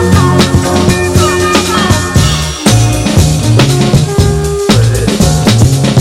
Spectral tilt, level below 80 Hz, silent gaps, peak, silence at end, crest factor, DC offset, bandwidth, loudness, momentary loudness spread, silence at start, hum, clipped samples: -5 dB/octave; -22 dBFS; none; 0 dBFS; 0 s; 8 dB; under 0.1%; 16.5 kHz; -9 LUFS; 2 LU; 0 s; none; 0.2%